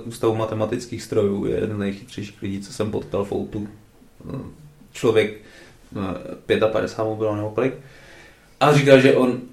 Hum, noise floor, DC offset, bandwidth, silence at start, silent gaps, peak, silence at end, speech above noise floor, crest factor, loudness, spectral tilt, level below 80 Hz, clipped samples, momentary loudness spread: none; -47 dBFS; under 0.1%; 14 kHz; 0 s; none; 0 dBFS; 0.05 s; 26 dB; 22 dB; -21 LUFS; -6 dB/octave; -52 dBFS; under 0.1%; 18 LU